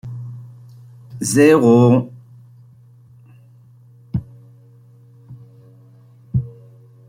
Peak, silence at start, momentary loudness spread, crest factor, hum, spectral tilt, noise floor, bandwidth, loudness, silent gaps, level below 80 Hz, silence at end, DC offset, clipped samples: -2 dBFS; 0.05 s; 25 LU; 18 dB; none; -6.5 dB/octave; -47 dBFS; 16 kHz; -16 LUFS; none; -50 dBFS; 0.6 s; under 0.1%; under 0.1%